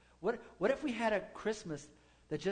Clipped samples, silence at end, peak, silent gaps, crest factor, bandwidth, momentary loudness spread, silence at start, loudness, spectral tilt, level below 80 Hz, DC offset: under 0.1%; 0 s; -20 dBFS; none; 18 dB; 9.4 kHz; 10 LU; 0.2 s; -38 LUFS; -5 dB/octave; -66 dBFS; under 0.1%